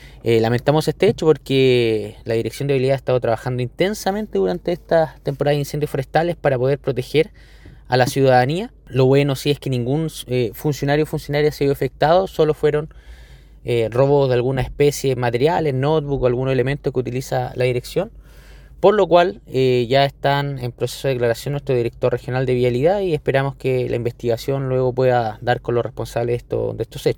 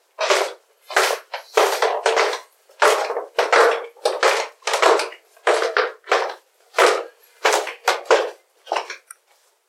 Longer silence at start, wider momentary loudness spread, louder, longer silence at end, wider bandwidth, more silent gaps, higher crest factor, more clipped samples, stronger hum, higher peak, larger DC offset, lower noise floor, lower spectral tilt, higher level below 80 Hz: second, 0 s vs 0.2 s; second, 8 LU vs 11 LU; about the same, -19 LUFS vs -20 LUFS; second, 0 s vs 0.7 s; about the same, 18 kHz vs 16.5 kHz; neither; about the same, 18 dB vs 20 dB; neither; neither; about the same, 0 dBFS vs -2 dBFS; neither; second, -43 dBFS vs -61 dBFS; first, -6.5 dB/octave vs 1.5 dB/octave; first, -42 dBFS vs -78 dBFS